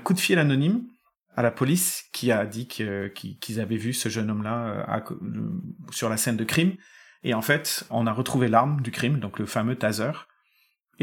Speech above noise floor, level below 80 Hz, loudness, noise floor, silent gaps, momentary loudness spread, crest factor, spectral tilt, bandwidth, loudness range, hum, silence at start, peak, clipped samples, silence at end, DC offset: 42 dB; -66 dBFS; -26 LUFS; -68 dBFS; 1.18-1.26 s; 12 LU; 22 dB; -5 dB/octave; 19 kHz; 5 LU; none; 0 s; -4 dBFS; under 0.1%; 0.8 s; under 0.1%